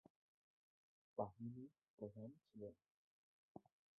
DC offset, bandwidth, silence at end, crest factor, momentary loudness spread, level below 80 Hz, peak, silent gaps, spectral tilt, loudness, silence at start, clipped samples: under 0.1%; 1.6 kHz; 0.4 s; 28 dB; 16 LU; -86 dBFS; -30 dBFS; 1.90-1.98 s, 2.90-3.55 s; -2.5 dB/octave; -55 LUFS; 1.15 s; under 0.1%